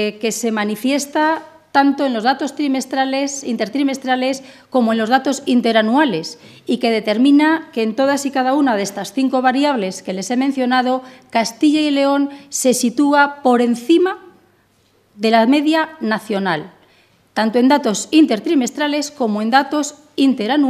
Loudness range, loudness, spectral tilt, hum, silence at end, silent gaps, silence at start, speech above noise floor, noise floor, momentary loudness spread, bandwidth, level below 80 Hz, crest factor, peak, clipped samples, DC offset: 2 LU; -17 LUFS; -4 dB/octave; none; 0 s; none; 0 s; 41 dB; -57 dBFS; 8 LU; 14.5 kHz; -72 dBFS; 16 dB; 0 dBFS; under 0.1%; under 0.1%